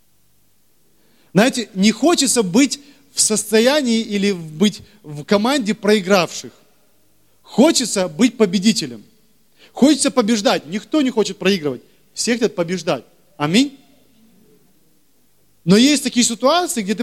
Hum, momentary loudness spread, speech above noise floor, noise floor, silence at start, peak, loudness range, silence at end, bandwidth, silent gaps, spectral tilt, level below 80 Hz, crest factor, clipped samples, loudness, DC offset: 50 Hz at -60 dBFS; 11 LU; 44 dB; -61 dBFS; 1.35 s; 0 dBFS; 5 LU; 0 s; 15.5 kHz; none; -4 dB/octave; -60 dBFS; 18 dB; under 0.1%; -17 LUFS; 0.2%